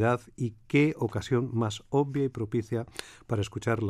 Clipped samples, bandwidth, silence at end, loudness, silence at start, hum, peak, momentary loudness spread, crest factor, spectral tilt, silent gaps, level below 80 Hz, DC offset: under 0.1%; 13.5 kHz; 0 s; -30 LUFS; 0 s; none; -12 dBFS; 10 LU; 16 dB; -7 dB/octave; none; -58 dBFS; under 0.1%